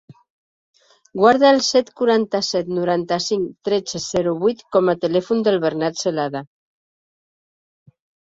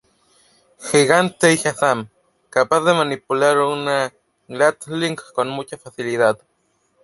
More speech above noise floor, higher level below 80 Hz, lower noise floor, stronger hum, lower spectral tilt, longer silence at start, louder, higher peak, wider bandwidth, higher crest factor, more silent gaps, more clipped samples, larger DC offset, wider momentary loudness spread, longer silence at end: first, over 72 dB vs 47 dB; about the same, -60 dBFS vs -64 dBFS; first, under -90 dBFS vs -66 dBFS; neither; about the same, -4.5 dB/octave vs -4 dB/octave; second, 0.1 s vs 0.8 s; about the same, -19 LUFS vs -18 LUFS; about the same, -2 dBFS vs -2 dBFS; second, 8 kHz vs 12 kHz; about the same, 18 dB vs 18 dB; first, 0.30-0.74 s vs none; neither; neither; second, 9 LU vs 13 LU; first, 1.85 s vs 0.7 s